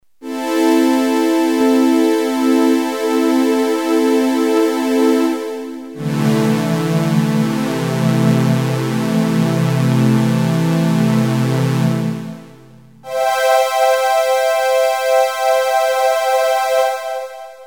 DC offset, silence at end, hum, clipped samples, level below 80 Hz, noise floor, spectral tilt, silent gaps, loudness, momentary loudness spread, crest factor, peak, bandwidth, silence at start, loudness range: 0.3%; 0 s; none; under 0.1%; -66 dBFS; -42 dBFS; -6 dB/octave; none; -15 LUFS; 7 LU; 14 dB; -2 dBFS; over 20 kHz; 0.2 s; 2 LU